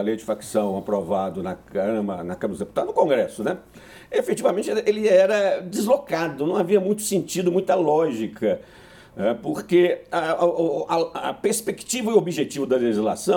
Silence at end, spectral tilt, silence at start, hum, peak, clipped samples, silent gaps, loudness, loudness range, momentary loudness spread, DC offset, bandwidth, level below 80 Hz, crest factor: 0 s; -5 dB/octave; 0 s; none; -4 dBFS; under 0.1%; none; -23 LUFS; 4 LU; 9 LU; under 0.1%; 18.5 kHz; -60 dBFS; 18 dB